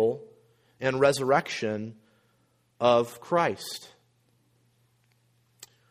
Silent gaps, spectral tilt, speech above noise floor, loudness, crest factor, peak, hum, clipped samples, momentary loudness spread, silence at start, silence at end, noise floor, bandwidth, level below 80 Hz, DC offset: none; -4.5 dB/octave; 43 dB; -26 LUFS; 22 dB; -8 dBFS; none; under 0.1%; 15 LU; 0 s; 2.05 s; -68 dBFS; 15.5 kHz; -70 dBFS; under 0.1%